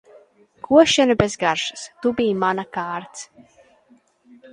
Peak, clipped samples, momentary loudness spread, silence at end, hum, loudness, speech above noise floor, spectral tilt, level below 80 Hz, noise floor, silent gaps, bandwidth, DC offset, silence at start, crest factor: 0 dBFS; under 0.1%; 17 LU; 1.3 s; none; -19 LUFS; 37 dB; -4 dB/octave; -52 dBFS; -57 dBFS; none; 11 kHz; under 0.1%; 0.7 s; 22 dB